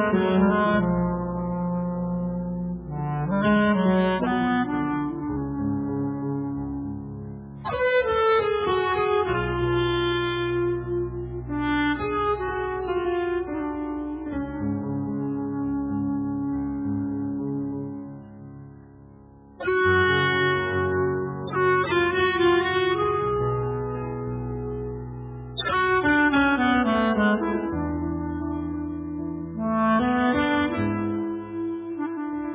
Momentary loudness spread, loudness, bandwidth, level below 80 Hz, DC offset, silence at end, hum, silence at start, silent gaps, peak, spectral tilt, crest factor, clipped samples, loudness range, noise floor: 11 LU; -25 LUFS; 4 kHz; -44 dBFS; under 0.1%; 0 s; none; 0 s; none; -10 dBFS; -5 dB/octave; 14 dB; under 0.1%; 6 LU; -48 dBFS